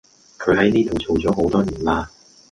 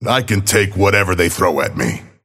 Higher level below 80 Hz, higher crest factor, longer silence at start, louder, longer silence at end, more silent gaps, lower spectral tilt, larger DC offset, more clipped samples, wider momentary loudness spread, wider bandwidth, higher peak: about the same, -40 dBFS vs -40 dBFS; about the same, 16 dB vs 16 dB; first, 0.4 s vs 0 s; second, -19 LUFS vs -15 LUFS; first, 0.45 s vs 0.2 s; neither; first, -6.5 dB/octave vs -4 dB/octave; neither; neither; about the same, 8 LU vs 6 LU; second, 11 kHz vs 16.5 kHz; second, -4 dBFS vs 0 dBFS